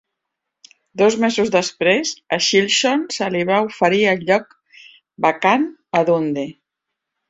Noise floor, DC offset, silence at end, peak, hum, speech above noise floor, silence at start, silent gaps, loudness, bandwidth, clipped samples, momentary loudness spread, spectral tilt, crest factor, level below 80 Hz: -80 dBFS; under 0.1%; 0.75 s; -2 dBFS; none; 63 dB; 0.95 s; none; -17 LUFS; 8.2 kHz; under 0.1%; 6 LU; -3.5 dB/octave; 18 dB; -62 dBFS